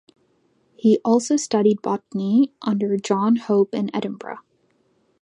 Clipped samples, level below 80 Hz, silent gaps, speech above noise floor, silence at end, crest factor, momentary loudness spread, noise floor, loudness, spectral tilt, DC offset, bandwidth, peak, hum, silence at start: under 0.1%; -72 dBFS; none; 44 dB; 0.85 s; 16 dB; 10 LU; -64 dBFS; -21 LUFS; -6 dB/octave; under 0.1%; 10.5 kHz; -4 dBFS; none; 0.85 s